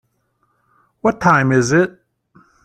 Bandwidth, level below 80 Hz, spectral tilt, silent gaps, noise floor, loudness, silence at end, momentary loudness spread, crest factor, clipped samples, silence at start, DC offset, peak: 9.6 kHz; -54 dBFS; -6 dB/octave; none; -65 dBFS; -15 LUFS; 0.75 s; 7 LU; 18 dB; under 0.1%; 1.05 s; under 0.1%; -2 dBFS